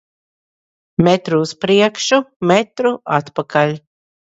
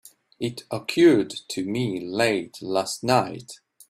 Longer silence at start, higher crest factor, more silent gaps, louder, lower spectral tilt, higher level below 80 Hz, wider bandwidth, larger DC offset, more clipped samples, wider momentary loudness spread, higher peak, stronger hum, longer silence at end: first, 1 s vs 0.4 s; about the same, 16 dB vs 18 dB; first, 2.36-2.40 s vs none; first, -16 LUFS vs -24 LUFS; about the same, -5 dB/octave vs -5 dB/octave; first, -52 dBFS vs -64 dBFS; second, 8 kHz vs 15 kHz; neither; neither; second, 6 LU vs 14 LU; first, 0 dBFS vs -6 dBFS; neither; first, 0.55 s vs 0.35 s